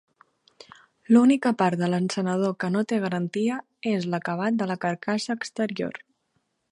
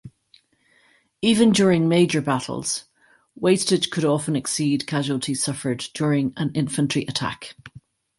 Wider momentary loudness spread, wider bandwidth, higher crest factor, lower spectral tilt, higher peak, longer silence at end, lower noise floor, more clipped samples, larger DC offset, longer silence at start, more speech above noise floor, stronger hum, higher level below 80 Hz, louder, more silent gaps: about the same, 9 LU vs 9 LU; about the same, 11 kHz vs 12 kHz; about the same, 18 dB vs 18 dB; about the same, -6 dB/octave vs -5 dB/octave; second, -8 dBFS vs -4 dBFS; first, 0.75 s vs 0.5 s; first, -73 dBFS vs -61 dBFS; neither; neither; first, 1.1 s vs 0.05 s; first, 50 dB vs 40 dB; neither; second, -72 dBFS vs -58 dBFS; second, -25 LUFS vs -22 LUFS; neither